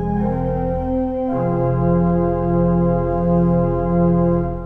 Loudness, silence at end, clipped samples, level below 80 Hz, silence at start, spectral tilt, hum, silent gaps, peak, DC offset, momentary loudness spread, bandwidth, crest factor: -18 LUFS; 0 s; under 0.1%; -30 dBFS; 0 s; -12.5 dB/octave; none; none; -6 dBFS; under 0.1%; 5 LU; 2.9 kHz; 12 dB